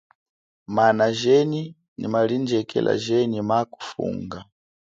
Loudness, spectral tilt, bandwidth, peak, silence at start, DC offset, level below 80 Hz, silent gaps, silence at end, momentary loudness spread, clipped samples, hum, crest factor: -22 LUFS; -6 dB/octave; 7.8 kHz; -6 dBFS; 0.7 s; under 0.1%; -60 dBFS; 1.88-1.96 s; 0.55 s; 14 LU; under 0.1%; none; 18 dB